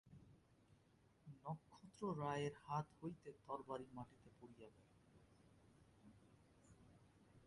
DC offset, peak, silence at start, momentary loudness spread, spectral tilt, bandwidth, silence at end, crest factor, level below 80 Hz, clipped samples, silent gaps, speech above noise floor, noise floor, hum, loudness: under 0.1%; -32 dBFS; 0.05 s; 23 LU; -7 dB/octave; 11 kHz; 0 s; 22 dB; -80 dBFS; under 0.1%; none; 25 dB; -75 dBFS; none; -50 LUFS